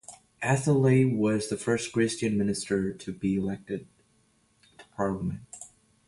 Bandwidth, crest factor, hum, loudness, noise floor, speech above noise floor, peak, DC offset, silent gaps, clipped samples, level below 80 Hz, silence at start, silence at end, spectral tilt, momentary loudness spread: 11.5 kHz; 18 dB; none; -28 LUFS; -67 dBFS; 40 dB; -12 dBFS; under 0.1%; none; under 0.1%; -56 dBFS; 0.1 s; 0.4 s; -6 dB/octave; 19 LU